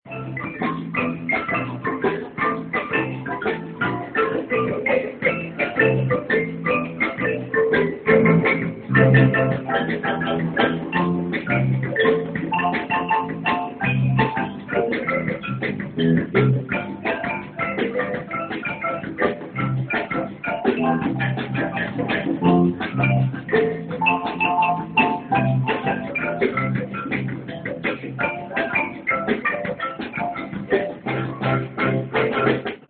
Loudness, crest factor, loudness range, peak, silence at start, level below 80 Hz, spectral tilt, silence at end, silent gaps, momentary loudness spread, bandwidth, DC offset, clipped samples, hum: -22 LUFS; 20 dB; 6 LU; -2 dBFS; 0.05 s; -52 dBFS; -11.5 dB/octave; 0.05 s; none; 8 LU; 4.4 kHz; under 0.1%; under 0.1%; none